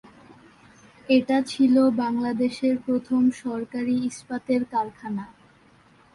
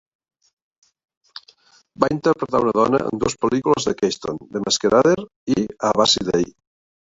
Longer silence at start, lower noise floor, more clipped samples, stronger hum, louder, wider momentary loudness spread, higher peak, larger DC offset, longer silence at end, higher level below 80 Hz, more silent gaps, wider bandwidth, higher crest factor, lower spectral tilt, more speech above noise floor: second, 0.3 s vs 2 s; about the same, -56 dBFS vs -54 dBFS; neither; neither; second, -24 LUFS vs -19 LUFS; about the same, 12 LU vs 12 LU; second, -8 dBFS vs 0 dBFS; neither; first, 0.9 s vs 0.55 s; second, -64 dBFS vs -52 dBFS; second, none vs 5.36-5.47 s; first, 11.5 kHz vs 8 kHz; about the same, 16 dB vs 20 dB; first, -5.5 dB/octave vs -4 dB/octave; about the same, 33 dB vs 35 dB